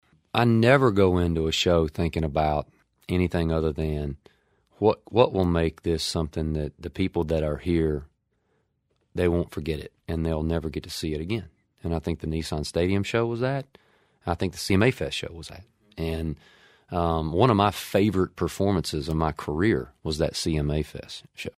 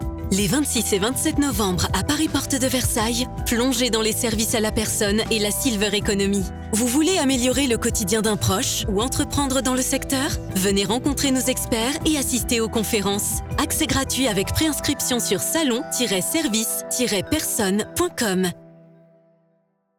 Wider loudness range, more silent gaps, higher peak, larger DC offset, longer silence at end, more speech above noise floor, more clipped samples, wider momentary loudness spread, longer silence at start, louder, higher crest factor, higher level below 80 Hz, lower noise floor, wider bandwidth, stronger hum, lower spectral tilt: first, 5 LU vs 1 LU; neither; first, -4 dBFS vs -10 dBFS; neither; second, 0.1 s vs 1.3 s; about the same, 47 dB vs 45 dB; neither; first, 12 LU vs 3 LU; first, 0.35 s vs 0 s; second, -26 LUFS vs -21 LUFS; first, 22 dB vs 12 dB; about the same, -40 dBFS vs -38 dBFS; first, -72 dBFS vs -66 dBFS; second, 15.5 kHz vs over 20 kHz; neither; first, -6 dB/octave vs -3.5 dB/octave